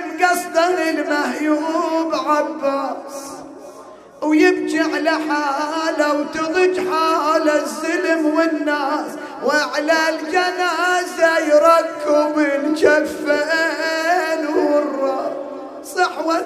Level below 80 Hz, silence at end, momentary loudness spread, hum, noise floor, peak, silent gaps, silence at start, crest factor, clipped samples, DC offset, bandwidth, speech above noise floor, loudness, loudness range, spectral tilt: -62 dBFS; 0 s; 9 LU; none; -40 dBFS; 0 dBFS; none; 0 s; 18 dB; under 0.1%; under 0.1%; 15 kHz; 22 dB; -18 LUFS; 4 LU; -2.5 dB/octave